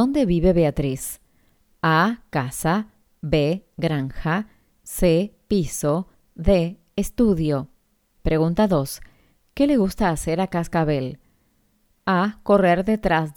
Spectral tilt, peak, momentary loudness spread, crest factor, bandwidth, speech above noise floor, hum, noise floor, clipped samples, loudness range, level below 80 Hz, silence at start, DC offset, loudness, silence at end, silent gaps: -6 dB/octave; -4 dBFS; 13 LU; 18 dB; 19.5 kHz; 43 dB; none; -64 dBFS; under 0.1%; 2 LU; -36 dBFS; 0 s; under 0.1%; -22 LUFS; 0.05 s; none